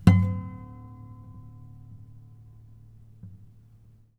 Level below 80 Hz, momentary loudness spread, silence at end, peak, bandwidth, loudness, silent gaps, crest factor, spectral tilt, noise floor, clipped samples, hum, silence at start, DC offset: -48 dBFS; 25 LU; 0.9 s; -2 dBFS; 10 kHz; -26 LUFS; none; 28 dB; -8.5 dB/octave; -55 dBFS; under 0.1%; none; 0.05 s; under 0.1%